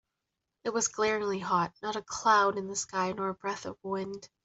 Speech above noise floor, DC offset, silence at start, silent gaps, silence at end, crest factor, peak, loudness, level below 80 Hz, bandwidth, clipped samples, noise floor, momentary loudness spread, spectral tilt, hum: 55 dB; under 0.1%; 0.65 s; none; 0.2 s; 20 dB; -12 dBFS; -30 LUFS; -68 dBFS; 8.2 kHz; under 0.1%; -86 dBFS; 11 LU; -3 dB/octave; none